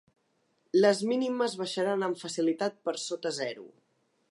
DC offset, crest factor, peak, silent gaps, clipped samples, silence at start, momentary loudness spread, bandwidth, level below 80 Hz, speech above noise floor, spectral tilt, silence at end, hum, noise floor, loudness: under 0.1%; 20 dB; -10 dBFS; none; under 0.1%; 0.75 s; 10 LU; 11.5 kHz; -86 dBFS; 44 dB; -4 dB/octave; 0.65 s; none; -73 dBFS; -30 LUFS